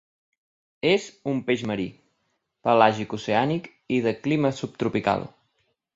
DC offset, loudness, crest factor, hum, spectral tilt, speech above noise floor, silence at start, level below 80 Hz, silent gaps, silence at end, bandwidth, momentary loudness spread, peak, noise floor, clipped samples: under 0.1%; -25 LUFS; 24 dB; none; -6 dB/octave; 51 dB; 0.85 s; -62 dBFS; none; 0.65 s; 8 kHz; 11 LU; -2 dBFS; -75 dBFS; under 0.1%